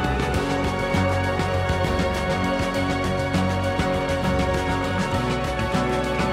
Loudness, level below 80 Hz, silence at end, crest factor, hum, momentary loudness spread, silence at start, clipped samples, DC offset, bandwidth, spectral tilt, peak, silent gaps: -23 LUFS; -34 dBFS; 0 s; 10 dB; none; 1 LU; 0 s; under 0.1%; under 0.1%; 15.5 kHz; -6 dB/octave; -12 dBFS; none